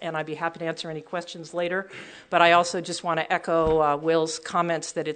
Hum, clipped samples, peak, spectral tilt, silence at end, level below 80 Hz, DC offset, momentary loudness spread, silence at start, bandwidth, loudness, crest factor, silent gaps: none; under 0.1%; -2 dBFS; -4 dB/octave; 0 s; -52 dBFS; under 0.1%; 14 LU; 0 s; 9.4 kHz; -25 LUFS; 22 dB; none